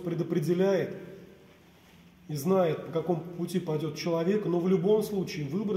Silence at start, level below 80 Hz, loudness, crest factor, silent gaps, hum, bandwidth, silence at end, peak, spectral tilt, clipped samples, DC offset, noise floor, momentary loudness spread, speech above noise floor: 0 s; -66 dBFS; -29 LUFS; 16 dB; none; none; 16 kHz; 0 s; -14 dBFS; -7 dB/octave; under 0.1%; under 0.1%; -56 dBFS; 8 LU; 28 dB